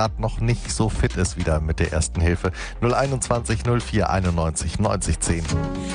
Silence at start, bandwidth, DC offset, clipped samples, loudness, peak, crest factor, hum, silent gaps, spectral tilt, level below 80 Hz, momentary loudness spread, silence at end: 0 s; 10 kHz; under 0.1%; under 0.1%; -23 LUFS; -6 dBFS; 16 dB; none; none; -5.5 dB/octave; -30 dBFS; 3 LU; 0 s